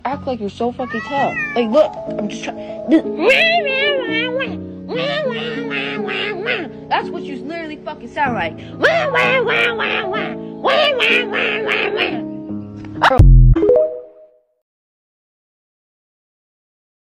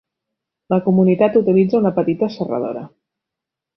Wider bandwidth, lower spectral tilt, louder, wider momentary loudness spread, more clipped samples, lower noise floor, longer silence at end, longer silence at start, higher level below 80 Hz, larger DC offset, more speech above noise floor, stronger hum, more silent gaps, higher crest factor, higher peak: first, 8.8 kHz vs 5.8 kHz; second, -6 dB/octave vs -10.5 dB/octave; about the same, -17 LUFS vs -17 LUFS; first, 15 LU vs 10 LU; neither; second, -48 dBFS vs -84 dBFS; first, 3.1 s vs 0.9 s; second, 0.05 s vs 0.7 s; first, -24 dBFS vs -60 dBFS; neither; second, 31 dB vs 68 dB; neither; neither; about the same, 18 dB vs 16 dB; about the same, 0 dBFS vs -2 dBFS